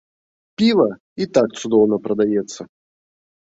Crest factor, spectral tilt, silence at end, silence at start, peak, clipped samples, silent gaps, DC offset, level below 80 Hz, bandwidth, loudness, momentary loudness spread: 18 dB; -5.5 dB/octave; 0.8 s; 0.6 s; -2 dBFS; under 0.1%; 1.00-1.16 s; under 0.1%; -60 dBFS; 8 kHz; -18 LUFS; 15 LU